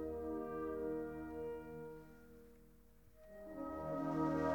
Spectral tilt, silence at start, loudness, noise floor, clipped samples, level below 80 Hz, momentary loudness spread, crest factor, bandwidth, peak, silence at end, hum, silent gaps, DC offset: -8.5 dB/octave; 0 s; -44 LUFS; -66 dBFS; under 0.1%; -64 dBFS; 22 LU; 18 dB; 19 kHz; -26 dBFS; 0 s; none; none; under 0.1%